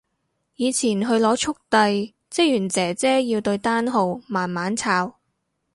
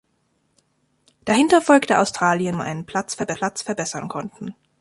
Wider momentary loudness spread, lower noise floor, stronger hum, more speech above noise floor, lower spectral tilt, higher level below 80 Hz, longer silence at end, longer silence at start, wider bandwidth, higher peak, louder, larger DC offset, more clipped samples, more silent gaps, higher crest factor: second, 6 LU vs 17 LU; first, -74 dBFS vs -68 dBFS; neither; first, 53 dB vs 47 dB; about the same, -4 dB/octave vs -4.5 dB/octave; about the same, -62 dBFS vs -60 dBFS; first, 0.65 s vs 0.3 s; second, 0.6 s vs 1.25 s; about the same, 11.5 kHz vs 11.5 kHz; about the same, -4 dBFS vs -2 dBFS; about the same, -21 LUFS vs -20 LUFS; neither; neither; neither; about the same, 18 dB vs 18 dB